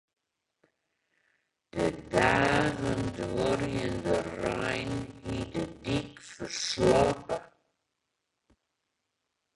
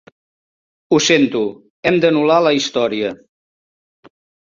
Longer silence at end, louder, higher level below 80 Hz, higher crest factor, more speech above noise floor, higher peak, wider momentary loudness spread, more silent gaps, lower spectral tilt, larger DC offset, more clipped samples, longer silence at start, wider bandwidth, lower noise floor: first, 2.1 s vs 1.35 s; second, -30 LUFS vs -16 LUFS; first, -52 dBFS vs -58 dBFS; first, 24 dB vs 16 dB; second, 55 dB vs over 75 dB; second, -8 dBFS vs -2 dBFS; first, 13 LU vs 9 LU; second, none vs 1.70-1.83 s; about the same, -5 dB/octave vs -4 dB/octave; neither; neither; first, 1.75 s vs 0.9 s; first, 11.5 kHz vs 7.6 kHz; second, -83 dBFS vs under -90 dBFS